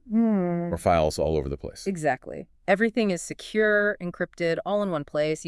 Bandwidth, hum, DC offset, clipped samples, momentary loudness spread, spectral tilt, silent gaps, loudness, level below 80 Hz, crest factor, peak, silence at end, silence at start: 12 kHz; none; under 0.1%; under 0.1%; 10 LU; -5.5 dB/octave; none; -26 LUFS; -48 dBFS; 16 dB; -8 dBFS; 0 s; 0.05 s